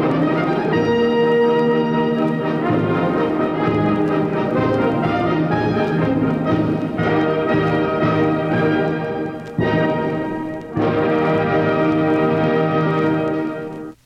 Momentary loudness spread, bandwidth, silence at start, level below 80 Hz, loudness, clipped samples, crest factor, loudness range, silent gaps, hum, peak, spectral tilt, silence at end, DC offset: 5 LU; 7.2 kHz; 0 s; -46 dBFS; -18 LUFS; under 0.1%; 12 dB; 2 LU; none; none; -6 dBFS; -8.5 dB/octave; 0.1 s; under 0.1%